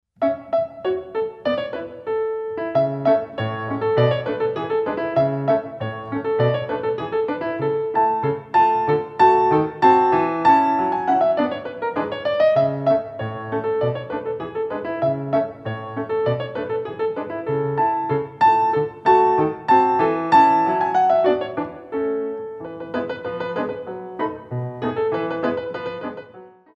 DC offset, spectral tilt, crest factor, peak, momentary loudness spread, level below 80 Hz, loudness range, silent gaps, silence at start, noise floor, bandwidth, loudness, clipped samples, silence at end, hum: under 0.1%; -8 dB/octave; 18 dB; -2 dBFS; 12 LU; -58 dBFS; 8 LU; none; 0.2 s; -44 dBFS; 8 kHz; -21 LUFS; under 0.1%; 0.25 s; none